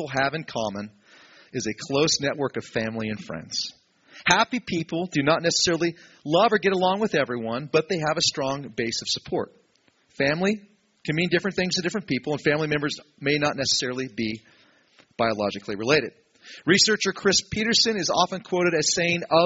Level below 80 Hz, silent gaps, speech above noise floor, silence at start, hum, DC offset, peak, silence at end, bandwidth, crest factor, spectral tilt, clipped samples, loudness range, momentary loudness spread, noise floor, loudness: -58 dBFS; none; 40 dB; 0 s; none; under 0.1%; 0 dBFS; 0 s; 8 kHz; 24 dB; -2.5 dB/octave; under 0.1%; 5 LU; 11 LU; -64 dBFS; -24 LUFS